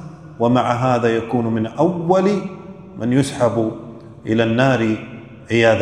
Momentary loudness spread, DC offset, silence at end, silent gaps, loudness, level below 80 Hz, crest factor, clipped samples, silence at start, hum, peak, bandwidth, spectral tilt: 19 LU; 0.1%; 0 s; none; -18 LUFS; -54 dBFS; 18 dB; under 0.1%; 0 s; none; 0 dBFS; 12 kHz; -6.5 dB/octave